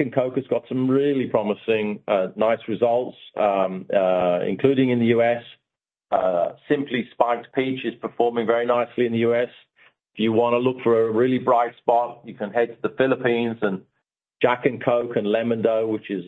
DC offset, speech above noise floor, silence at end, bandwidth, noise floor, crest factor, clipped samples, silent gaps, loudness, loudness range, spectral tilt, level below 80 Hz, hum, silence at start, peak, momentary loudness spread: under 0.1%; 64 dB; 0 s; 4.1 kHz; -85 dBFS; 18 dB; under 0.1%; none; -22 LUFS; 2 LU; -8.5 dB/octave; -66 dBFS; none; 0 s; -2 dBFS; 6 LU